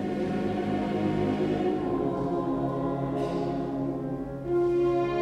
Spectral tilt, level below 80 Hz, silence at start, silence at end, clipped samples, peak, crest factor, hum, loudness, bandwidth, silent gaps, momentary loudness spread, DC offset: -8.5 dB/octave; -50 dBFS; 0 s; 0 s; under 0.1%; -16 dBFS; 12 dB; none; -28 LUFS; 8.8 kHz; none; 5 LU; under 0.1%